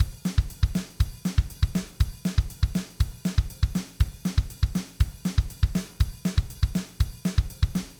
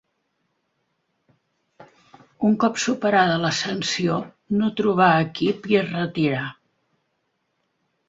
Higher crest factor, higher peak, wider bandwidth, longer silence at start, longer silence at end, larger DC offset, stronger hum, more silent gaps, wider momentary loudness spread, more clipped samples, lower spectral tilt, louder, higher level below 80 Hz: about the same, 18 dB vs 20 dB; second, -8 dBFS vs -2 dBFS; first, over 20 kHz vs 8 kHz; second, 0 s vs 1.8 s; second, 0.05 s vs 1.55 s; neither; neither; neither; second, 3 LU vs 8 LU; neither; about the same, -6 dB/octave vs -5 dB/octave; second, -28 LUFS vs -21 LUFS; first, -30 dBFS vs -62 dBFS